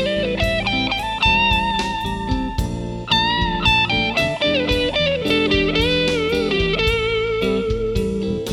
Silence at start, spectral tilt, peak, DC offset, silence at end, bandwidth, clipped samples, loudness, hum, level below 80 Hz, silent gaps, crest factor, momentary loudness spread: 0 s; -5 dB/octave; -4 dBFS; under 0.1%; 0 s; 15.5 kHz; under 0.1%; -18 LUFS; none; -30 dBFS; none; 16 dB; 7 LU